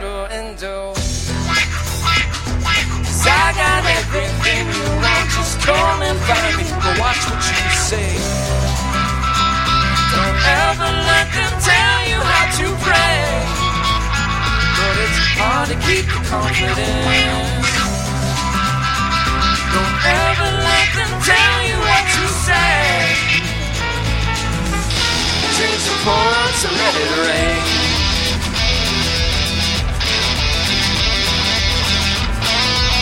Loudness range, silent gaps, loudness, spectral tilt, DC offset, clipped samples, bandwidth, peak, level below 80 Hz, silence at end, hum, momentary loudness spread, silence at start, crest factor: 3 LU; none; -15 LUFS; -3 dB/octave; under 0.1%; under 0.1%; 16.5 kHz; 0 dBFS; -24 dBFS; 0 s; none; 6 LU; 0 s; 16 dB